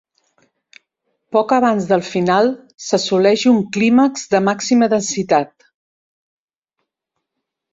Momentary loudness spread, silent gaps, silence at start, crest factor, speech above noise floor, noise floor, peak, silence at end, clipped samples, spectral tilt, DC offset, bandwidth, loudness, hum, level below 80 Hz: 6 LU; none; 1.3 s; 16 dB; 64 dB; -79 dBFS; -2 dBFS; 2.3 s; under 0.1%; -4.5 dB/octave; under 0.1%; 7.8 kHz; -16 LUFS; none; -60 dBFS